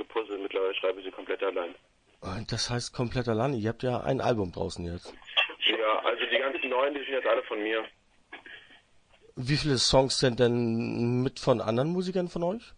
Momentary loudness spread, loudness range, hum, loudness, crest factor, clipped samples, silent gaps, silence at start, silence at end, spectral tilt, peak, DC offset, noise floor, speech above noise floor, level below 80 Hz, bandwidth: 15 LU; 5 LU; none; -28 LUFS; 20 dB; under 0.1%; none; 0 s; 0.05 s; -4.5 dB/octave; -10 dBFS; under 0.1%; -61 dBFS; 32 dB; -52 dBFS; 10.5 kHz